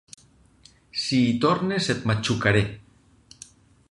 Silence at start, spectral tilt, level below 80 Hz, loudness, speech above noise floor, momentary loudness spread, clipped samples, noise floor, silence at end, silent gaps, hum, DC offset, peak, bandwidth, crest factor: 0.95 s; -5.5 dB/octave; -50 dBFS; -23 LUFS; 33 dB; 20 LU; under 0.1%; -56 dBFS; 1.1 s; none; none; under 0.1%; -4 dBFS; 11.5 kHz; 20 dB